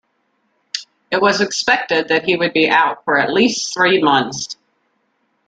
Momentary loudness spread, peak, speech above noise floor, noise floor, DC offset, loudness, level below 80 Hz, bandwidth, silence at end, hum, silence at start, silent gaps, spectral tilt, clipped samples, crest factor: 14 LU; 0 dBFS; 50 dB; -66 dBFS; under 0.1%; -15 LUFS; -60 dBFS; 9.4 kHz; 0.95 s; none; 0.75 s; none; -3 dB/octave; under 0.1%; 18 dB